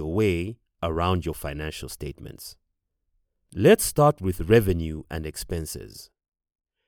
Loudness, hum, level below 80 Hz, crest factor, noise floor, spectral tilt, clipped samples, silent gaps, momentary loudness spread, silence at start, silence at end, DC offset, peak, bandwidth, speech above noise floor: -24 LUFS; none; -42 dBFS; 22 dB; -77 dBFS; -5.5 dB/octave; under 0.1%; none; 21 LU; 0 s; 0.85 s; under 0.1%; -4 dBFS; over 20 kHz; 53 dB